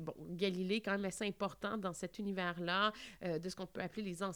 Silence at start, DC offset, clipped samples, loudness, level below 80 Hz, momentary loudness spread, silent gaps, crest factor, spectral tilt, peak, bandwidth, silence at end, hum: 0 s; under 0.1%; under 0.1%; -40 LUFS; -70 dBFS; 8 LU; none; 18 dB; -4.5 dB/octave; -22 dBFS; over 20 kHz; 0 s; none